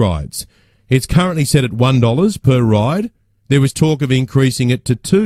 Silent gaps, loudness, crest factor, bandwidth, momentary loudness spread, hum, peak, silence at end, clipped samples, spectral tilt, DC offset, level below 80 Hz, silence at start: none; -14 LUFS; 14 dB; 15 kHz; 9 LU; none; 0 dBFS; 0 s; under 0.1%; -6 dB/octave; under 0.1%; -36 dBFS; 0 s